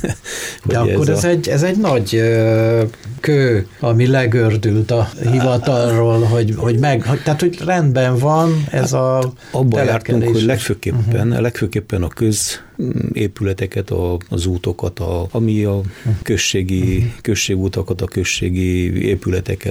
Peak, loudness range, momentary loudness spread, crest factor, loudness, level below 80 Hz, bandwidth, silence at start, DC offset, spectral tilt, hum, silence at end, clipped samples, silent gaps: -4 dBFS; 5 LU; 7 LU; 12 dB; -16 LUFS; -38 dBFS; 16 kHz; 0 s; under 0.1%; -6 dB/octave; none; 0 s; under 0.1%; none